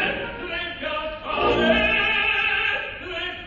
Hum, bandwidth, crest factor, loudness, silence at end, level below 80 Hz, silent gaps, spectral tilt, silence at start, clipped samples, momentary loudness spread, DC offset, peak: none; 7.4 kHz; 18 dB; -22 LUFS; 0 s; -42 dBFS; none; -5 dB/octave; 0 s; under 0.1%; 11 LU; under 0.1%; -6 dBFS